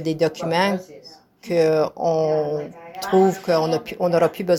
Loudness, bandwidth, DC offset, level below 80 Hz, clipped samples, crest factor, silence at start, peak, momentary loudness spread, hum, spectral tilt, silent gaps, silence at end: -21 LUFS; 18 kHz; under 0.1%; -62 dBFS; under 0.1%; 16 dB; 0 s; -4 dBFS; 11 LU; none; -6 dB/octave; none; 0 s